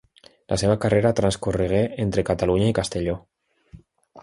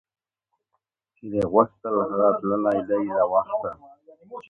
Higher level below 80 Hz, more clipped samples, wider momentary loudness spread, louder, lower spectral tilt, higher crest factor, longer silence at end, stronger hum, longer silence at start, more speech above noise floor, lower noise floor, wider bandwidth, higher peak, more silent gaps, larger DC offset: first, -42 dBFS vs -60 dBFS; neither; about the same, 8 LU vs 10 LU; about the same, -22 LUFS vs -23 LUFS; second, -6 dB/octave vs -9 dB/octave; about the same, 18 dB vs 22 dB; about the same, 0 s vs 0.1 s; neither; second, 0.5 s vs 1.25 s; second, 28 dB vs 57 dB; second, -49 dBFS vs -79 dBFS; first, 11.5 kHz vs 6 kHz; about the same, -4 dBFS vs -2 dBFS; neither; neither